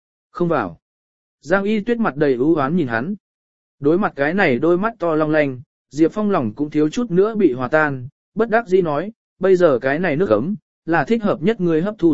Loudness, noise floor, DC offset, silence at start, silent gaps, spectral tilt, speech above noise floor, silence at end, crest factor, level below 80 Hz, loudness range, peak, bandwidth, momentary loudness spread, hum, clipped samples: -18 LUFS; under -90 dBFS; 1%; 0.3 s; 0.82-1.38 s, 3.20-3.78 s, 5.66-5.85 s, 8.12-8.32 s, 9.16-9.36 s, 10.62-10.82 s; -7.5 dB/octave; over 73 dB; 0 s; 18 dB; -52 dBFS; 2 LU; 0 dBFS; 7.8 kHz; 9 LU; none; under 0.1%